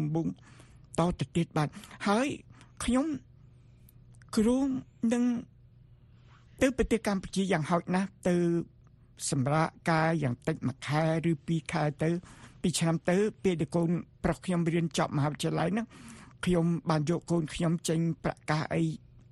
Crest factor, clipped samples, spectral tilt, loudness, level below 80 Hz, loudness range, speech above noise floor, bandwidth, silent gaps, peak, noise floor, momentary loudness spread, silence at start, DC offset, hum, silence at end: 18 dB; under 0.1%; -6 dB/octave; -30 LUFS; -52 dBFS; 2 LU; 27 dB; 12 kHz; none; -12 dBFS; -57 dBFS; 7 LU; 0 s; under 0.1%; none; 0.35 s